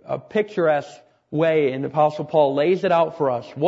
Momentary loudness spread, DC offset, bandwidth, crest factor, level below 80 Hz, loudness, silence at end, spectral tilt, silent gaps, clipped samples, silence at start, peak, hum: 6 LU; under 0.1%; 8 kHz; 16 dB; -68 dBFS; -21 LUFS; 0 s; -7.5 dB/octave; none; under 0.1%; 0.05 s; -6 dBFS; none